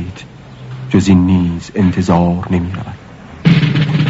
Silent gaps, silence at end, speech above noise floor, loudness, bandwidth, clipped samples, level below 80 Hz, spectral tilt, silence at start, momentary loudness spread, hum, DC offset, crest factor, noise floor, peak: none; 0 s; 21 dB; -13 LUFS; 8 kHz; under 0.1%; -38 dBFS; -7.5 dB/octave; 0 s; 20 LU; none; under 0.1%; 14 dB; -33 dBFS; 0 dBFS